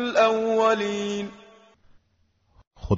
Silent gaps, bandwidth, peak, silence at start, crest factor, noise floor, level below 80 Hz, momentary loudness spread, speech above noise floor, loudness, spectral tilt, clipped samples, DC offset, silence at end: 2.67-2.71 s; 7.8 kHz; -8 dBFS; 0 s; 18 dB; -67 dBFS; -50 dBFS; 16 LU; 45 dB; -23 LUFS; -4 dB/octave; under 0.1%; under 0.1%; 0 s